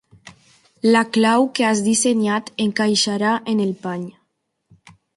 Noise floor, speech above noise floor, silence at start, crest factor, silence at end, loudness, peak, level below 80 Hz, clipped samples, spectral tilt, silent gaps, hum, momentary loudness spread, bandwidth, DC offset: -71 dBFS; 53 dB; 0.25 s; 16 dB; 1.05 s; -18 LUFS; -4 dBFS; -64 dBFS; under 0.1%; -3.5 dB/octave; none; none; 9 LU; 11.5 kHz; under 0.1%